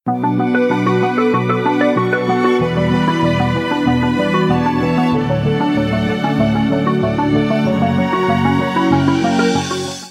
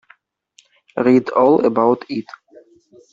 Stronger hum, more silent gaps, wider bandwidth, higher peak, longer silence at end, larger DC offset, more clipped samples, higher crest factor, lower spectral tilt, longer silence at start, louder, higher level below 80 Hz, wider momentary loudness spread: neither; neither; first, 13 kHz vs 7.4 kHz; about the same, 0 dBFS vs -2 dBFS; second, 0 s vs 0.9 s; neither; neither; about the same, 14 dB vs 16 dB; second, -6.5 dB/octave vs -8 dB/octave; second, 0.05 s vs 0.95 s; about the same, -15 LUFS vs -16 LUFS; first, -40 dBFS vs -62 dBFS; second, 2 LU vs 14 LU